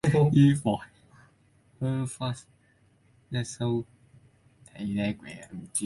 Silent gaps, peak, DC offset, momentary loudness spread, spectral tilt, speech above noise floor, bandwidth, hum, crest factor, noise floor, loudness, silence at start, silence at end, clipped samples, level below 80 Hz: none; -10 dBFS; under 0.1%; 20 LU; -6.5 dB/octave; 37 dB; 11.5 kHz; none; 20 dB; -64 dBFS; -28 LUFS; 0.05 s; 0 s; under 0.1%; -58 dBFS